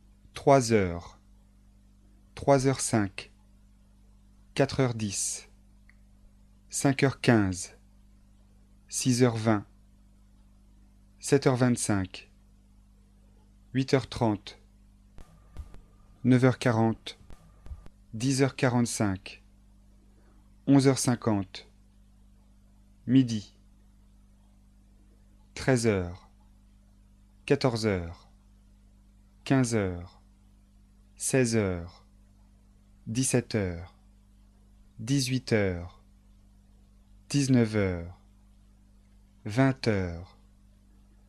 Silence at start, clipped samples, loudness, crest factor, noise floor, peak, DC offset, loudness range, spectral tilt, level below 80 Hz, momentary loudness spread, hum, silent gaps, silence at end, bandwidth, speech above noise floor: 0.35 s; under 0.1%; -27 LUFS; 24 dB; -58 dBFS; -6 dBFS; under 0.1%; 6 LU; -5.5 dB/octave; -54 dBFS; 21 LU; 50 Hz at -55 dBFS; none; 1.05 s; 13 kHz; 32 dB